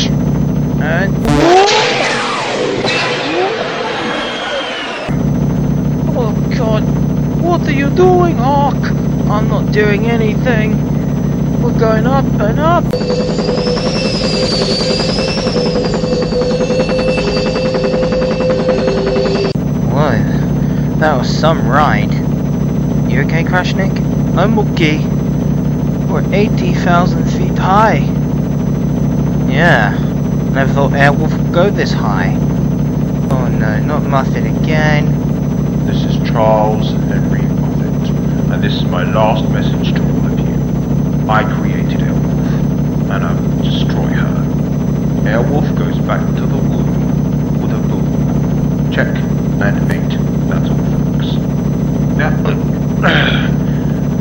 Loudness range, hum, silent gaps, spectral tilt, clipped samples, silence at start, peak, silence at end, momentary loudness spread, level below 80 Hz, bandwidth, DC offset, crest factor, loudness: 2 LU; none; none; -6.5 dB/octave; under 0.1%; 0 s; 0 dBFS; 0 s; 4 LU; -26 dBFS; 16.5 kHz; under 0.1%; 12 dB; -13 LUFS